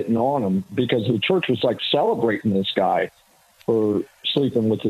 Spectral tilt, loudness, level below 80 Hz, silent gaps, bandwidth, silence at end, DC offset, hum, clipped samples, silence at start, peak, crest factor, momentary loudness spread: -7 dB/octave; -21 LUFS; -62 dBFS; none; 14 kHz; 0 s; under 0.1%; none; under 0.1%; 0 s; -4 dBFS; 16 dB; 4 LU